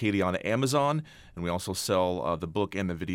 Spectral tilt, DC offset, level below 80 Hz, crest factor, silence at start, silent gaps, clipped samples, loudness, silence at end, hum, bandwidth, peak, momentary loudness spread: -5 dB/octave; under 0.1%; -56 dBFS; 16 dB; 0 s; none; under 0.1%; -29 LUFS; 0 s; none; 16.5 kHz; -12 dBFS; 8 LU